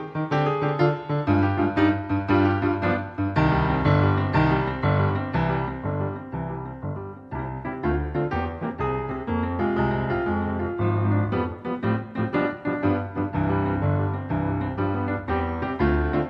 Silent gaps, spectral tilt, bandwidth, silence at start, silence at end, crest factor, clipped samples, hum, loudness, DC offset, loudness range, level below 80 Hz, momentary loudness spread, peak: none; -9.5 dB/octave; 5.8 kHz; 0 s; 0 s; 16 dB; under 0.1%; none; -25 LUFS; under 0.1%; 6 LU; -38 dBFS; 8 LU; -8 dBFS